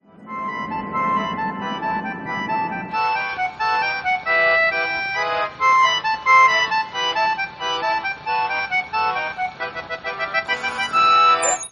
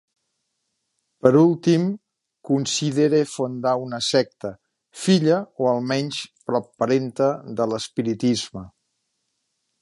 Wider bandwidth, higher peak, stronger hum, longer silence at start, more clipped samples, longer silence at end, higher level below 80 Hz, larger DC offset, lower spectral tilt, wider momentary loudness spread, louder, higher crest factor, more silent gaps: about the same, 10.5 kHz vs 11.5 kHz; about the same, -2 dBFS vs -2 dBFS; neither; second, 0.2 s vs 1.25 s; neither; second, 0 s vs 1.15 s; about the same, -58 dBFS vs -62 dBFS; neither; second, -1.5 dB/octave vs -5.5 dB/octave; about the same, 12 LU vs 11 LU; first, -19 LUFS vs -22 LUFS; about the same, 18 dB vs 22 dB; neither